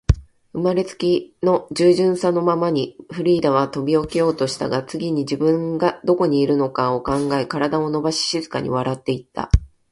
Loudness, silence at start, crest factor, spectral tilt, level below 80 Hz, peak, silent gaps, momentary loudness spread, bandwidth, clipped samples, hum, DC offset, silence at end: -20 LUFS; 0.1 s; 20 dB; -6 dB/octave; -32 dBFS; 0 dBFS; none; 6 LU; 11.5 kHz; under 0.1%; none; under 0.1%; 0.25 s